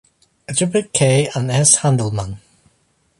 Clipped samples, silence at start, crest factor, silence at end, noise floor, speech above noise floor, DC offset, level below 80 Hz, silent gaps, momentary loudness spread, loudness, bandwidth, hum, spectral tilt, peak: under 0.1%; 0.5 s; 18 dB; 0.85 s; -62 dBFS; 45 dB; under 0.1%; -48 dBFS; none; 14 LU; -16 LUFS; 11.5 kHz; none; -4 dB/octave; 0 dBFS